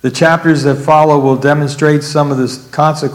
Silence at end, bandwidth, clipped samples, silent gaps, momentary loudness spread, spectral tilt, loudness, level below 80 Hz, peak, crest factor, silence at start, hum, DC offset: 0 s; 15 kHz; 0.8%; none; 5 LU; -6 dB/octave; -11 LUFS; -52 dBFS; 0 dBFS; 10 dB; 0.05 s; none; under 0.1%